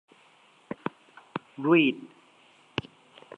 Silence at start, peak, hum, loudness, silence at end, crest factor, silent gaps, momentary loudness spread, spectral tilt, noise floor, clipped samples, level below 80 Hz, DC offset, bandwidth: 1.35 s; -10 dBFS; none; -28 LUFS; 1.3 s; 22 dB; none; 18 LU; -7 dB/octave; -60 dBFS; under 0.1%; -68 dBFS; under 0.1%; 6.4 kHz